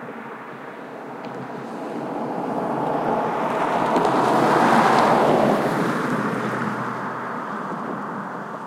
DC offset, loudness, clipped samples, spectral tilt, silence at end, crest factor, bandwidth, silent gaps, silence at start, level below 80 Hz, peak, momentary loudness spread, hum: under 0.1%; -21 LUFS; under 0.1%; -6 dB/octave; 0 s; 18 dB; 16.5 kHz; none; 0 s; -60 dBFS; -4 dBFS; 18 LU; none